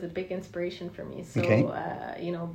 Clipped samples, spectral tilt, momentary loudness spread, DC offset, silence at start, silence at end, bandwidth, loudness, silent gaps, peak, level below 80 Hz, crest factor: under 0.1%; -7.5 dB/octave; 14 LU; under 0.1%; 0 s; 0 s; 15.5 kHz; -31 LUFS; none; -10 dBFS; -62 dBFS; 20 dB